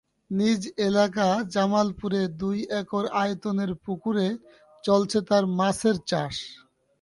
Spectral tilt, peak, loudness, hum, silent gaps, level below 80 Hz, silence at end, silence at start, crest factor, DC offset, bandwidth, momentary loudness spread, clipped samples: -5.5 dB/octave; -8 dBFS; -25 LUFS; none; none; -58 dBFS; 0.45 s; 0.3 s; 16 dB; under 0.1%; 11.5 kHz; 8 LU; under 0.1%